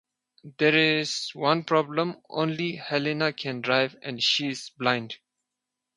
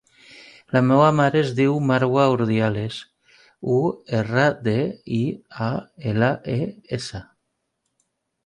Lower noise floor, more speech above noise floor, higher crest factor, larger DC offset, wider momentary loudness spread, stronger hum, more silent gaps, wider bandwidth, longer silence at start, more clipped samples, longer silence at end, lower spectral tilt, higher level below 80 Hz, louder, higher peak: first, -85 dBFS vs -75 dBFS; first, 59 dB vs 55 dB; about the same, 20 dB vs 18 dB; neither; second, 9 LU vs 13 LU; neither; neither; about the same, 11 kHz vs 10.5 kHz; about the same, 0.45 s vs 0.35 s; neither; second, 0.8 s vs 1.25 s; second, -4 dB/octave vs -7.5 dB/octave; second, -74 dBFS vs -56 dBFS; second, -25 LUFS vs -21 LUFS; about the same, -6 dBFS vs -4 dBFS